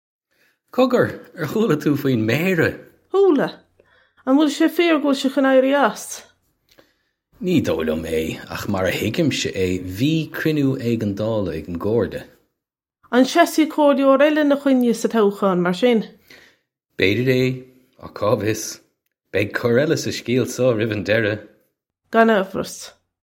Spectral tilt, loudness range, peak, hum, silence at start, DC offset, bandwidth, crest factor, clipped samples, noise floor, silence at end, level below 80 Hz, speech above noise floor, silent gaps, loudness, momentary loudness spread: -5.5 dB/octave; 5 LU; 0 dBFS; none; 0.75 s; under 0.1%; 17 kHz; 20 dB; under 0.1%; -84 dBFS; 0.4 s; -54 dBFS; 66 dB; none; -19 LUFS; 12 LU